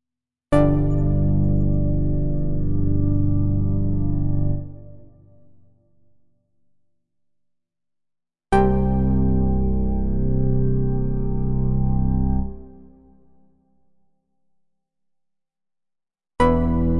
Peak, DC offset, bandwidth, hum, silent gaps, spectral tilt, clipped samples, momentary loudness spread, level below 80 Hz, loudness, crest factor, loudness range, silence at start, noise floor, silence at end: -6 dBFS; under 0.1%; 10.5 kHz; none; none; -10 dB/octave; under 0.1%; 6 LU; -28 dBFS; -22 LUFS; 16 dB; 9 LU; 0 s; -88 dBFS; 0 s